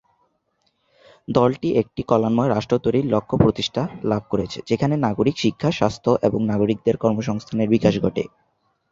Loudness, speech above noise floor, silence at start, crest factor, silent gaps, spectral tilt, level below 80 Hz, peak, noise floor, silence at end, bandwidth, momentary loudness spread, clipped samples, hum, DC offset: -21 LUFS; 49 dB; 1.3 s; 20 dB; none; -7 dB/octave; -48 dBFS; -2 dBFS; -69 dBFS; 0.65 s; 7.6 kHz; 7 LU; under 0.1%; none; under 0.1%